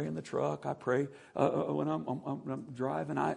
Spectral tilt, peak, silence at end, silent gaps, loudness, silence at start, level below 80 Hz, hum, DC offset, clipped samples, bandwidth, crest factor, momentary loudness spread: -7.5 dB/octave; -14 dBFS; 0 s; none; -35 LUFS; 0 s; -72 dBFS; none; under 0.1%; under 0.1%; 10.5 kHz; 20 dB; 7 LU